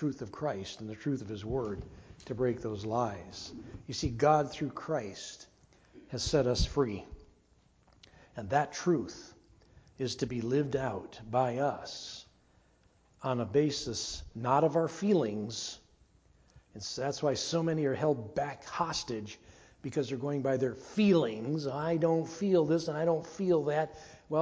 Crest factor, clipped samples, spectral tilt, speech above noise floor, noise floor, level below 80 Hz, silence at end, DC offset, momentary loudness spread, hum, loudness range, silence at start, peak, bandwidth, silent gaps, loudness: 20 dB; under 0.1%; -5.5 dB/octave; 35 dB; -66 dBFS; -52 dBFS; 0 s; under 0.1%; 15 LU; none; 5 LU; 0 s; -12 dBFS; 8 kHz; none; -32 LUFS